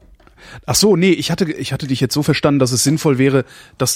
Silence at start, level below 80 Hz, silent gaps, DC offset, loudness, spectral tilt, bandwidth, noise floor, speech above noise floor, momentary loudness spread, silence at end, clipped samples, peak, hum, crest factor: 0.45 s; -46 dBFS; none; under 0.1%; -15 LUFS; -4.5 dB/octave; 16.5 kHz; -44 dBFS; 28 dB; 8 LU; 0 s; under 0.1%; -2 dBFS; none; 14 dB